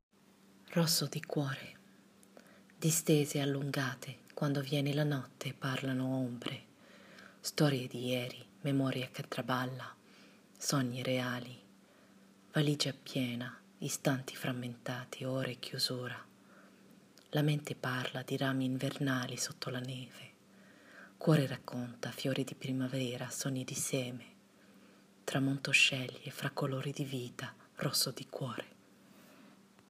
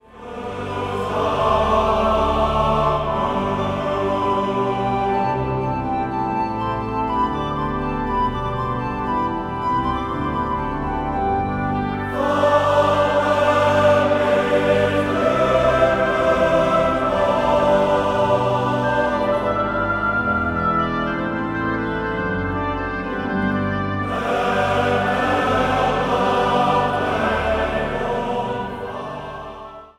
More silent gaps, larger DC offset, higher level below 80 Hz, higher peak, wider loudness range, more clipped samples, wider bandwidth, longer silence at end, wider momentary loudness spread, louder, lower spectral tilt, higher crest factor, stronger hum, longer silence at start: neither; neither; second, -82 dBFS vs -36 dBFS; second, -14 dBFS vs -4 dBFS; about the same, 5 LU vs 6 LU; neither; first, 15.5 kHz vs 13.5 kHz; first, 0.4 s vs 0.1 s; first, 14 LU vs 7 LU; second, -36 LUFS vs -20 LUFS; second, -4.5 dB/octave vs -6.5 dB/octave; first, 22 dB vs 16 dB; neither; first, 0.65 s vs 0.15 s